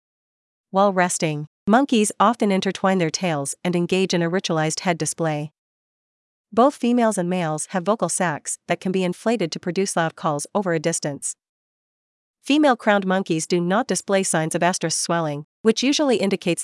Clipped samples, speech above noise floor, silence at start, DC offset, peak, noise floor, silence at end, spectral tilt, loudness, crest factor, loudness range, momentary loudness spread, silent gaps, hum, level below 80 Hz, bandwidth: under 0.1%; over 69 dB; 0.75 s; under 0.1%; -2 dBFS; under -90 dBFS; 0 s; -4.5 dB/octave; -21 LUFS; 18 dB; 3 LU; 7 LU; 1.47-1.66 s, 5.58-6.44 s, 11.49-12.34 s, 15.44-15.64 s; none; -72 dBFS; 12 kHz